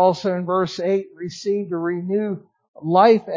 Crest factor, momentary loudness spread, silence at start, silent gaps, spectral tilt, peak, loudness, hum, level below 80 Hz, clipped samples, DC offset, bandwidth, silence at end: 18 dB; 14 LU; 0 s; 2.68-2.74 s; -6.5 dB/octave; -2 dBFS; -21 LUFS; none; -66 dBFS; under 0.1%; under 0.1%; 7.6 kHz; 0 s